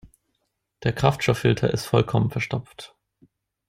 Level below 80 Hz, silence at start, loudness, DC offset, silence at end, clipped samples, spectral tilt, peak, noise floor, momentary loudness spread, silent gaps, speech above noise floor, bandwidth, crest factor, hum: -48 dBFS; 0.05 s; -23 LUFS; under 0.1%; 0.8 s; under 0.1%; -6 dB/octave; -2 dBFS; -76 dBFS; 18 LU; none; 53 dB; 15.5 kHz; 22 dB; none